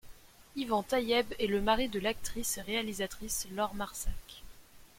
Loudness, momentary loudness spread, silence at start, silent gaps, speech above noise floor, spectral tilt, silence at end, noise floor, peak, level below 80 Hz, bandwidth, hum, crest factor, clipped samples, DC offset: -33 LUFS; 12 LU; 0.05 s; none; 21 dB; -3 dB/octave; 0.15 s; -54 dBFS; -14 dBFS; -48 dBFS; 16.5 kHz; none; 20 dB; under 0.1%; under 0.1%